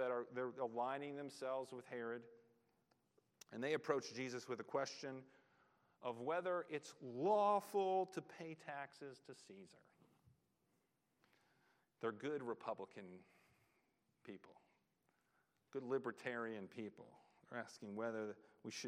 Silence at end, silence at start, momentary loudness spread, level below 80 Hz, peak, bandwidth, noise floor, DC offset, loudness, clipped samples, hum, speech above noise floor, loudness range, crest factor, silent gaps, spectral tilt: 0 s; 0 s; 19 LU; under -90 dBFS; -24 dBFS; 13.5 kHz; -84 dBFS; under 0.1%; -45 LUFS; under 0.1%; none; 39 dB; 14 LU; 24 dB; none; -5 dB/octave